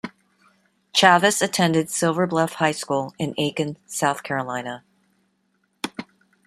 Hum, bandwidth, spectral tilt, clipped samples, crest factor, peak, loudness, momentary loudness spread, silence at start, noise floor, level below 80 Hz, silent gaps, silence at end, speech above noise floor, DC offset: none; 15 kHz; -3.5 dB/octave; under 0.1%; 22 dB; -2 dBFS; -21 LUFS; 17 LU; 0.05 s; -69 dBFS; -66 dBFS; none; 0.45 s; 47 dB; under 0.1%